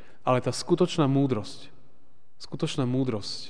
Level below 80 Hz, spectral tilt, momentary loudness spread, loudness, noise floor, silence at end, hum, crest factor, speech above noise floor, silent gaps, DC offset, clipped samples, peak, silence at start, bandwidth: -64 dBFS; -6 dB/octave; 18 LU; -26 LUFS; -65 dBFS; 0 s; none; 18 dB; 39 dB; none; 1%; under 0.1%; -10 dBFS; 0.25 s; 10 kHz